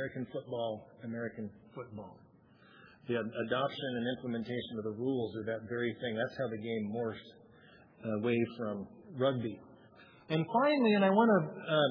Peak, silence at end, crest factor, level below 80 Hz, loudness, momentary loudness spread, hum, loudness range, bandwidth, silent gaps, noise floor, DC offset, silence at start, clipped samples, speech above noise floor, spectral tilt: -14 dBFS; 0 s; 20 dB; -76 dBFS; -34 LUFS; 18 LU; none; 8 LU; 5.4 kHz; none; -61 dBFS; under 0.1%; 0 s; under 0.1%; 28 dB; -4.5 dB/octave